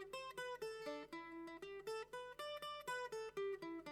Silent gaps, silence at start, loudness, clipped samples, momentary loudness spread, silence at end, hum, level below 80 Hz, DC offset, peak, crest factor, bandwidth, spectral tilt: none; 0 s; -49 LUFS; under 0.1%; 6 LU; 0 s; 50 Hz at -75 dBFS; -78 dBFS; under 0.1%; -36 dBFS; 14 dB; 18 kHz; -3 dB/octave